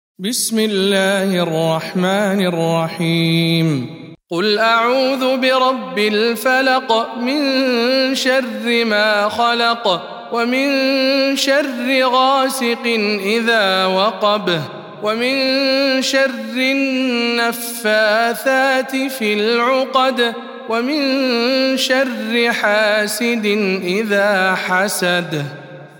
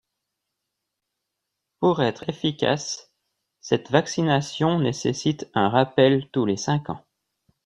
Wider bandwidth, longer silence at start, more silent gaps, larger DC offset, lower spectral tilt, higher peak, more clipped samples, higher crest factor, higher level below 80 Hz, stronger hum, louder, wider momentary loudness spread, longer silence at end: first, 18 kHz vs 10.5 kHz; second, 0.2 s vs 1.8 s; neither; neither; second, -4 dB/octave vs -5.5 dB/octave; about the same, -2 dBFS vs -2 dBFS; neither; second, 14 dB vs 22 dB; second, -68 dBFS vs -62 dBFS; neither; first, -16 LUFS vs -23 LUFS; second, 5 LU vs 8 LU; second, 0.1 s vs 0.65 s